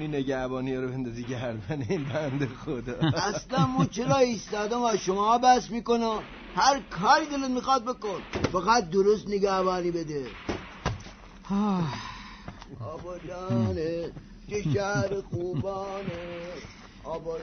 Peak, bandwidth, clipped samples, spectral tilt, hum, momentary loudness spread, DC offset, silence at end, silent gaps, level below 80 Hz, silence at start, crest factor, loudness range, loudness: -8 dBFS; 6.6 kHz; under 0.1%; -5.5 dB/octave; none; 15 LU; under 0.1%; 0 s; none; -50 dBFS; 0 s; 20 dB; 7 LU; -28 LUFS